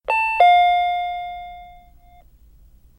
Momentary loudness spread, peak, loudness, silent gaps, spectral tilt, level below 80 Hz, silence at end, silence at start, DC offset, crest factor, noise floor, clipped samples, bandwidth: 21 LU; -2 dBFS; -17 LUFS; none; -2 dB/octave; -50 dBFS; 1.3 s; 0.1 s; under 0.1%; 18 dB; -49 dBFS; under 0.1%; 10.5 kHz